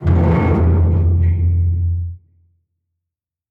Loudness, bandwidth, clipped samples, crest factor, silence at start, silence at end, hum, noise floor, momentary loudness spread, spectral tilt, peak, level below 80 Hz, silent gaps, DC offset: -16 LUFS; 3.3 kHz; under 0.1%; 12 dB; 0 s; 1.35 s; none; -84 dBFS; 7 LU; -11 dB/octave; -4 dBFS; -24 dBFS; none; under 0.1%